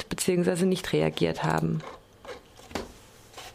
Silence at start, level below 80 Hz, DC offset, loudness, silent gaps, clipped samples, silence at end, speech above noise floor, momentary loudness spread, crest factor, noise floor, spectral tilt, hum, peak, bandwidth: 0 s; -54 dBFS; under 0.1%; -27 LUFS; none; under 0.1%; 0 s; 25 dB; 20 LU; 18 dB; -51 dBFS; -5.5 dB/octave; none; -10 dBFS; 15.5 kHz